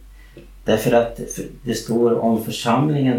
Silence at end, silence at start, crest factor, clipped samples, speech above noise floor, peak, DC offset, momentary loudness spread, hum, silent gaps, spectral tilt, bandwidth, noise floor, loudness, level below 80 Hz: 0 s; 0 s; 16 dB; under 0.1%; 23 dB; -4 dBFS; under 0.1%; 12 LU; none; none; -6 dB/octave; 17 kHz; -42 dBFS; -20 LUFS; -44 dBFS